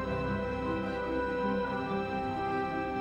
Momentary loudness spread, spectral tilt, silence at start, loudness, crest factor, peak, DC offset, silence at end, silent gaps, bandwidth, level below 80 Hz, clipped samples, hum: 2 LU; -7.5 dB/octave; 0 s; -33 LUFS; 12 dB; -20 dBFS; under 0.1%; 0 s; none; 9.8 kHz; -48 dBFS; under 0.1%; none